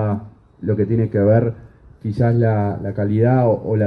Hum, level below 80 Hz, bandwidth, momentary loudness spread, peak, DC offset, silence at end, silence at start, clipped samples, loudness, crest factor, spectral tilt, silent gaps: none; -46 dBFS; 5 kHz; 12 LU; -2 dBFS; under 0.1%; 0 s; 0 s; under 0.1%; -18 LUFS; 16 dB; -11.5 dB/octave; none